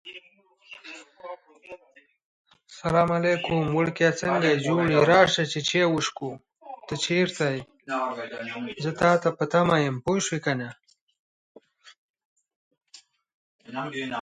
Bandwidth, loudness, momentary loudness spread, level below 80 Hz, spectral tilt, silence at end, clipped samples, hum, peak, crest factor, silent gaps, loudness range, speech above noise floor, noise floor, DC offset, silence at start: 10.5 kHz; -24 LUFS; 21 LU; -60 dBFS; -5 dB/octave; 0 s; under 0.1%; none; -4 dBFS; 22 dB; 2.23-2.45 s, 11.01-11.07 s, 11.19-11.55 s, 11.98-12.14 s, 12.25-12.36 s, 12.56-12.71 s, 13.34-13.59 s; 10 LU; 36 dB; -60 dBFS; under 0.1%; 0.05 s